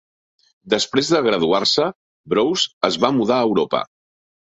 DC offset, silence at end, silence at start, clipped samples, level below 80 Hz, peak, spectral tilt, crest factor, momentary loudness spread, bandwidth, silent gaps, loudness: under 0.1%; 0.65 s; 0.65 s; under 0.1%; -60 dBFS; -2 dBFS; -4 dB/octave; 18 dB; 6 LU; 8.2 kHz; 1.95-2.24 s, 2.73-2.81 s; -18 LUFS